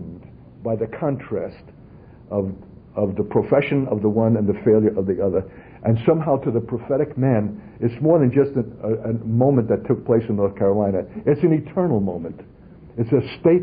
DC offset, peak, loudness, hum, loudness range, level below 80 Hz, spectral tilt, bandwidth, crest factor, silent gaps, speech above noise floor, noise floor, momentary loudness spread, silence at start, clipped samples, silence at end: under 0.1%; -2 dBFS; -21 LUFS; none; 4 LU; -50 dBFS; -13.5 dB/octave; 5 kHz; 18 dB; none; 24 dB; -44 dBFS; 11 LU; 0 s; under 0.1%; 0 s